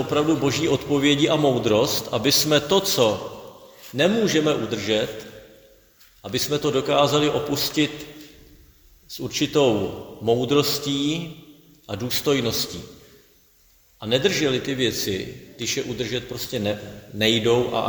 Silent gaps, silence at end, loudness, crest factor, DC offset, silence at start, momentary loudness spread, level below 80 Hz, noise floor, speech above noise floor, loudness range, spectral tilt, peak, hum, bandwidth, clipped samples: none; 0 s; -22 LUFS; 20 dB; under 0.1%; 0 s; 15 LU; -52 dBFS; -57 dBFS; 35 dB; 5 LU; -4 dB/octave; -2 dBFS; none; over 20 kHz; under 0.1%